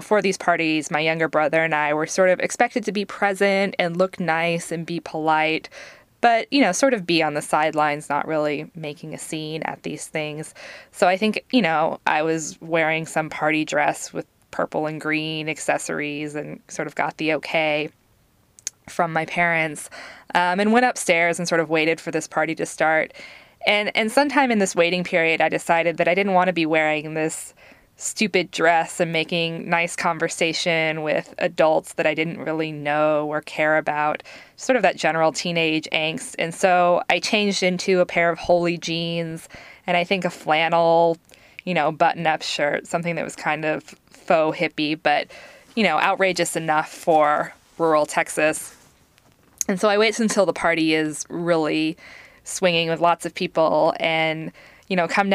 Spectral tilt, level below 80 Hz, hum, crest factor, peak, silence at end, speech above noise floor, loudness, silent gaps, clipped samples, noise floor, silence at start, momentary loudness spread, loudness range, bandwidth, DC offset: -4 dB/octave; -62 dBFS; none; 18 dB; -2 dBFS; 0 s; 39 dB; -21 LUFS; none; under 0.1%; -60 dBFS; 0 s; 11 LU; 4 LU; 15.5 kHz; under 0.1%